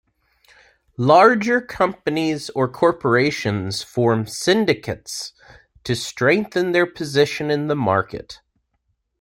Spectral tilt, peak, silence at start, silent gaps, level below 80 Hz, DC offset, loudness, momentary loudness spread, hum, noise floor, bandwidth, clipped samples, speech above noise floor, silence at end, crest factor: -5 dB/octave; -2 dBFS; 1 s; none; -54 dBFS; under 0.1%; -19 LUFS; 14 LU; none; -71 dBFS; 16.5 kHz; under 0.1%; 52 dB; 0.85 s; 18 dB